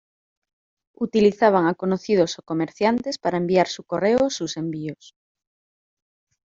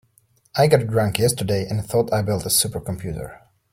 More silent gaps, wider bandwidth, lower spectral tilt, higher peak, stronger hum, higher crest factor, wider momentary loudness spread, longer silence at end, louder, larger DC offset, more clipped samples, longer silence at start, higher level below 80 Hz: neither; second, 7.8 kHz vs 16.5 kHz; about the same, -5.5 dB/octave vs -4.5 dB/octave; about the same, -4 dBFS vs -2 dBFS; neither; about the same, 20 dB vs 20 dB; about the same, 10 LU vs 12 LU; first, 1.55 s vs 0.35 s; about the same, -22 LUFS vs -21 LUFS; neither; neither; first, 1 s vs 0.55 s; second, -62 dBFS vs -48 dBFS